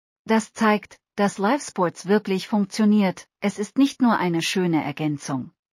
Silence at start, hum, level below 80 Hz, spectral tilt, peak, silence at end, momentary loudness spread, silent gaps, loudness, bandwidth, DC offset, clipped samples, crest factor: 0.25 s; none; -70 dBFS; -5.5 dB/octave; -6 dBFS; 0.25 s; 8 LU; none; -23 LUFS; 14 kHz; under 0.1%; under 0.1%; 16 dB